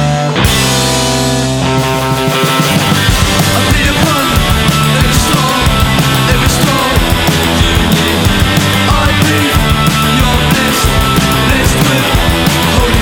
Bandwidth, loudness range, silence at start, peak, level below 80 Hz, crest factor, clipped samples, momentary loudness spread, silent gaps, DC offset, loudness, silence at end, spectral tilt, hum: 19.5 kHz; 1 LU; 0 s; 0 dBFS; -18 dBFS; 10 dB; under 0.1%; 2 LU; none; under 0.1%; -9 LUFS; 0 s; -4 dB/octave; none